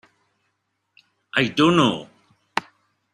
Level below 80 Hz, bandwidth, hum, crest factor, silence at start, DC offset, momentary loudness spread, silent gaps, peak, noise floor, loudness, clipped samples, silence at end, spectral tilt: -62 dBFS; 12 kHz; none; 22 dB; 1.35 s; under 0.1%; 12 LU; none; -2 dBFS; -74 dBFS; -21 LUFS; under 0.1%; 0.55 s; -5.5 dB/octave